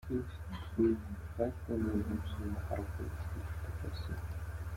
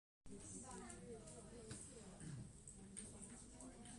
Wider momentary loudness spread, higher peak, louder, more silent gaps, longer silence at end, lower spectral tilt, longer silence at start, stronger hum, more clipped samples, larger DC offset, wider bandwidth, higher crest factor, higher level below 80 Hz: first, 10 LU vs 4 LU; first, -18 dBFS vs -36 dBFS; first, -39 LUFS vs -56 LUFS; neither; about the same, 0 s vs 0 s; first, -8 dB/octave vs -4 dB/octave; second, 0 s vs 0.25 s; neither; neither; neither; first, 16.5 kHz vs 11.5 kHz; about the same, 18 dB vs 20 dB; first, -46 dBFS vs -68 dBFS